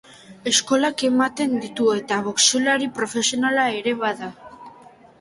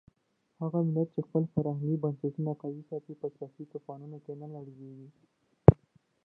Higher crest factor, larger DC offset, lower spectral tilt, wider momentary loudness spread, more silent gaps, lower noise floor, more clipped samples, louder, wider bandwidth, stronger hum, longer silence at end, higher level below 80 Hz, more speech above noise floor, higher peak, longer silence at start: second, 20 dB vs 30 dB; neither; second, -2 dB/octave vs -13 dB/octave; second, 8 LU vs 22 LU; neither; second, -48 dBFS vs -76 dBFS; neither; first, -20 LUFS vs -30 LUFS; first, 11.5 kHz vs 3 kHz; neither; about the same, 0.5 s vs 0.5 s; second, -66 dBFS vs -48 dBFS; second, 27 dB vs 42 dB; about the same, -2 dBFS vs 0 dBFS; second, 0.3 s vs 0.6 s